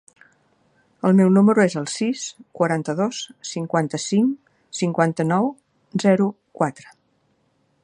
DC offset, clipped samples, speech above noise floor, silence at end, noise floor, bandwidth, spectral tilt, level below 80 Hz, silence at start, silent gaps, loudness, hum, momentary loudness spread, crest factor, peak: under 0.1%; under 0.1%; 46 dB; 1 s; -65 dBFS; 11 kHz; -6 dB/octave; -68 dBFS; 1.05 s; none; -21 LUFS; none; 14 LU; 20 dB; -2 dBFS